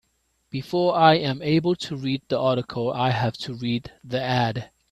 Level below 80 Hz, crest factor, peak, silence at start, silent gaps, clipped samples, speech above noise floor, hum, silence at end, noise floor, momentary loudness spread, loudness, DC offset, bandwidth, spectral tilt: -58 dBFS; 20 dB; -2 dBFS; 0.55 s; none; under 0.1%; 47 dB; none; 0.25 s; -70 dBFS; 12 LU; -23 LUFS; under 0.1%; 13 kHz; -6.5 dB/octave